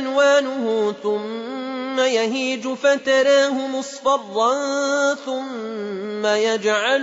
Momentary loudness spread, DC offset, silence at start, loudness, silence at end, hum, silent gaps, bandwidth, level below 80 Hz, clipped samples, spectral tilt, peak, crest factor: 12 LU; under 0.1%; 0 s; -20 LUFS; 0 s; none; none; 8 kHz; -72 dBFS; under 0.1%; -2.5 dB/octave; -6 dBFS; 14 dB